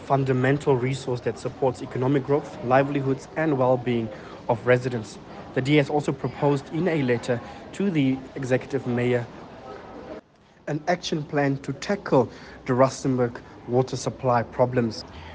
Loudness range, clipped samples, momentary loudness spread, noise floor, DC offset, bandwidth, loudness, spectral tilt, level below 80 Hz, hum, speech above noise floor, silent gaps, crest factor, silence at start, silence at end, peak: 4 LU; under 0.1%; 16 LU; -49 dBFS; under 0.1%; 9.4 kHz; -25 LUFS; -6.5 dB/octave; -56 dBFS; none; 25 dB; none; 18 dB; 0 s; 0 s; -6 dBFS